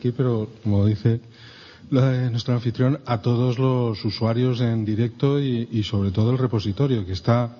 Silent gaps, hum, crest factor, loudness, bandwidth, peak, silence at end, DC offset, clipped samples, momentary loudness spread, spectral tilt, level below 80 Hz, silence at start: none; none; 16 dB; -22 LUFS; 6.8 kHz; -6 dBFS; 0 s; under 0.1%; under 0.1%; 4 LU; -8.5 dB/octave; -54 dBFS; 0 s